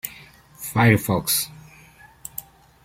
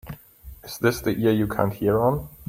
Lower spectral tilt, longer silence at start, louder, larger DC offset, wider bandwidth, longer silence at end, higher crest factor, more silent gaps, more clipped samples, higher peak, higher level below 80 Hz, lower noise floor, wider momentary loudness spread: second, -4.5 dB/octave vs -6.5 dB/octave; about the same, 0.05 s vs 0.05 s; first, -20 LUFS vs -23 LUFS; neither; about the same, 16.5 kHz vs 16.5 kHz; first, 0.45 s vs 0.05 s; about the same, 22 dB vs 20 dB; neither; neither; about the same, -2 dBFS vs -4 dBFS; second, -52 dBFS vs -46 dBFS; first, -50 dBFS vs -45 dBFS; about the same, 18 LU vs 20 LU